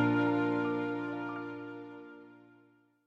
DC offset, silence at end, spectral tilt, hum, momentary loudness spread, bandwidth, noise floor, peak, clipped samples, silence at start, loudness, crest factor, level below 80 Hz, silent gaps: under 0.1%; 0.65 s; -8.5 dB/octave; none; 20 LU; 6.2 kHz; -66 dBFS; -18 dBFS; under 0.1%; 0 s; -34 LUFS; 16 dB; -74 dBFS; none